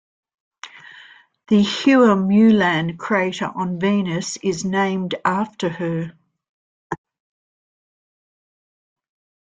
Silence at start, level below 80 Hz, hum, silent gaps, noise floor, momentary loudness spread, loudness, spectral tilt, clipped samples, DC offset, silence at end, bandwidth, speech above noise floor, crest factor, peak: 0.65 s; -60 dBFS; none; 6.49-6.90 s; -47 dBFS; 19 LU; -19 LUFS; -5.5 dB/octave; under 0.1%; under 0.1%; 2.55 s; 9.2 kHz; 29 dB; 18 dB; -4 dBFS